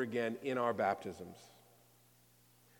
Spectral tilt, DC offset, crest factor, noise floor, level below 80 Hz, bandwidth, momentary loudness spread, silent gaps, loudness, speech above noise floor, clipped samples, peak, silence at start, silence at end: -6 dB/octave; under 0.1%; 20 dB; -67 dBFS; -82 dBFS; 18 kHz; 18 LU; none; -37 LUFS; 30 dB; under 0.1%; -20 dBFS; 0 s; 1.3 s